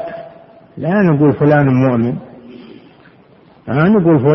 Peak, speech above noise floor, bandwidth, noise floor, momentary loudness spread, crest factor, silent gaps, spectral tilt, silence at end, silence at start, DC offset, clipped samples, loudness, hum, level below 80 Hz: 0 dBFS; 34 dB; 5.8 kHz; -45 dBFS; 17 LU; 14 dB; none; -11 dB/octave; 0 s; 0 s; under 0.1%; under 0.1%; -13 LUFS; none; -48 dBFS